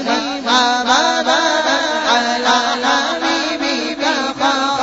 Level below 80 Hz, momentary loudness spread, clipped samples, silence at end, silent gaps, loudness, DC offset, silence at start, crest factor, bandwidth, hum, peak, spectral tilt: -52 dBFS; 4 LU; under 0.1%; 0 s; none; -15 LUFS; under 0.1%; 0 s; 14 dB; 8 kHz; none; -2 dBFS; 1 dB/octave